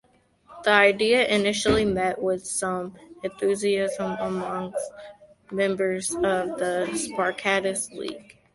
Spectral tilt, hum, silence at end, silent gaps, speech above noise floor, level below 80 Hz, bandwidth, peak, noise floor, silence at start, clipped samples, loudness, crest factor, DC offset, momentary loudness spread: -3.5 dB/octave; none; 0.35 s; none; 32 dB; -52 dBFS; 12 kHz; -4 dBFS; -57 dBFS; 0.5 s; under 0.1%; -24 LUFS; 22 dB; under 0.1%; 15 LU